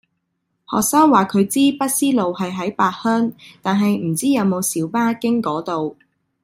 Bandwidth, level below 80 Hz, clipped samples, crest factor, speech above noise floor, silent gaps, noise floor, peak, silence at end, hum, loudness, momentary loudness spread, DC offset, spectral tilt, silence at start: 16 kHz; -60 dBFS; under 0.1%; 18 dB; 55 dB; none; -73 dBFS; -2 dBFS; 0.5 s; none; -18 LUFS; 10 LU; under 0.1%; -4.5 dB/octave; 0.7 s